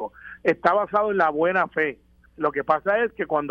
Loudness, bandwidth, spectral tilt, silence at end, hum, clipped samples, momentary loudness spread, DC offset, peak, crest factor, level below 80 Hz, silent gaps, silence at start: -23 LUFS; 7 kHz; -7 dB/octave; 0 s; none; under 0.1%; 6 LU; under 0.1%; -2 dBFS; 20 dB; -58 dBFS; none; 0 s